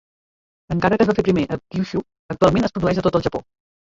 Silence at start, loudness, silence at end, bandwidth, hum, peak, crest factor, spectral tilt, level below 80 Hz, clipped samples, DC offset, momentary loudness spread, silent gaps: 0.7 s; -20 LUFS; 0.4 s; 7.8 kHz; none; -2 dBFS; 18 dB; -7.5 dB/octave; -42 dBFS; under 0.1%; under 0.1%; 10 LU; 2.19-2.29 s